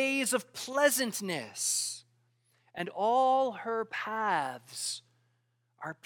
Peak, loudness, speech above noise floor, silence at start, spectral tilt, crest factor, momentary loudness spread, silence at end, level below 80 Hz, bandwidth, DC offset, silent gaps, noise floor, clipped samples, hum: -12 dBFS; -31 LUFS; 44 dB; 0 s; -2 dB/octave; 20 dB; 14 LU; 0.15 s; -88 dBFS; 19 kHz; under 0.1%; none; -75 dBFS; under 0.1%; none